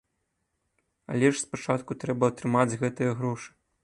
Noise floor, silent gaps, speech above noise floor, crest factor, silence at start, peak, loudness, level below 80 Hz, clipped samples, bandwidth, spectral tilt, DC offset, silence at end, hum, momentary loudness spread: -78 dBFS; none; 51 dB; 22 dB; 1.1 s; -8 dBFS; -27 LUFS; -66 dBFS; under 0.1%; 11.5 kHz; -6 dB/octave; under 0.1%; 0.35 s; none; 8 LU